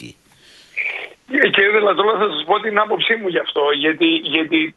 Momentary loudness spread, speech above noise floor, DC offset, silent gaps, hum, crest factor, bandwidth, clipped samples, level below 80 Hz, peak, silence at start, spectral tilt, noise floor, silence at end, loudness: 10 LU; 32 dB; under 0.1%; none; none; 18 dB; 7.6 kHz; under 0.1%; -66 dBFS; 0 dBFS; 0 s; -5 dB/octave; -49 dBFS; 0.05 s; -16 LUFS